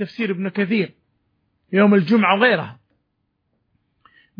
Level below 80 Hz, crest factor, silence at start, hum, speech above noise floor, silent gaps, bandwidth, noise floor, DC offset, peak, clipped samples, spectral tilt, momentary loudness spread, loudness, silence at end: -72 dBFS; 18 dB; 0 s; none; 54 dB; none; 5.2 kHz; -72 dBFS; under 0.1%; -4 dBFS; under 0.1%; -8.5 dB/octave; 10 LU; -18 LUFS; 1.65 s